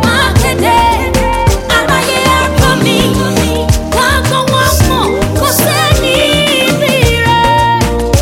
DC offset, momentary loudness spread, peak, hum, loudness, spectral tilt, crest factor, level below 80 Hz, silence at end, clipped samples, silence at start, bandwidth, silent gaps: under 0.1%; 3 LU; 0 dBFS; none; -10 LUFS; -4 dB/octave; 10 dB; -20 dBFS; 0 s; under 0.1%; 0 s; 17.5 kHz; none